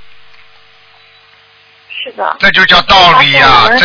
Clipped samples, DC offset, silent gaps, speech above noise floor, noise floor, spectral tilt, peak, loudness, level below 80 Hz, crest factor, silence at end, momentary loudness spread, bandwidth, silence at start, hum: 3%; under 0.1%; none; 37 dB; -43 dBFS; -3.5 dB/octave; 0 dBFS; -5 LUFS; -34 dBFS; 10 dB; 0 s; 18 LU; 5.4 kHz; 0 s; none